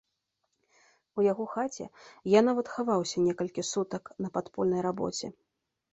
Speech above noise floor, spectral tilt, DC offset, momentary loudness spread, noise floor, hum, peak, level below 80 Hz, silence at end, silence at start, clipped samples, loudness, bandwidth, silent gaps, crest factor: 51 dB; -5 dB/octave; under 0.1%; 15 LU; -80 dBFS; none; -8 dBFS; -70 dBFS; 0.6 s; 1.15 s; under 0.1%; -30 LUFS; 8.2 kHz; none; 22 dB